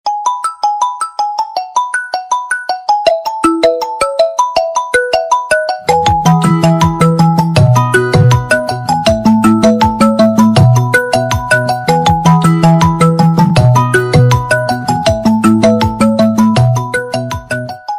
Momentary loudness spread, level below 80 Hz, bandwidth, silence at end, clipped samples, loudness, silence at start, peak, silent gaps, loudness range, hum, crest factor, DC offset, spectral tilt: 7 LU; -32 dBFS; 15.5 kHz; 0 s; under 0.1%; -11 LUFS; 0.05 s; 0 dBFS; none; 4 LU; none; 10 dB; under 0.1%; -6 dB/octave